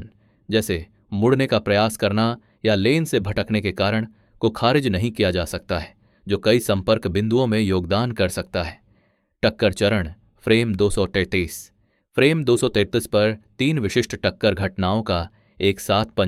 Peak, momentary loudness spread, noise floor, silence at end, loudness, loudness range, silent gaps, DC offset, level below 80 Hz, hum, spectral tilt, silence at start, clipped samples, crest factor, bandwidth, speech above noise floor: -2 dBFS; 8 LU; -63 dBFS; 0 s; -21 LUFS; 2 LU; none; under 0.1%; -44 dBFS; none; -5.5 dB/octave; 0 s; under 0.1%; 18 dB; 16 kHz; 43 dB